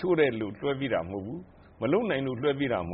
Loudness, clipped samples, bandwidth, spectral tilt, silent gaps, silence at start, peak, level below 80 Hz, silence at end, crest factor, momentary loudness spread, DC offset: -29 LUFS; under 0.1%; 4.1 kHz; -5 dB/octave; none; 0 s; -10 dBFS; -58 dBFS; 0 s; 18 dB; 11 LU; under 0.1%